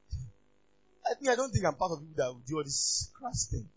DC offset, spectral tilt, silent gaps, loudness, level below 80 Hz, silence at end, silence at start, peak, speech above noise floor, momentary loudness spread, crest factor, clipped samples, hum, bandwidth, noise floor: under 0.1%; -3.5 dB/octave; none; -32 LUFS; -48 dBFS; 0.1 s; 0.1 s; -14 dBFS; 38 dB; 10 LU; 20 dB; under 0.1%; 50 Hz at -60 dBFS; 8 kHz; -71 dBFS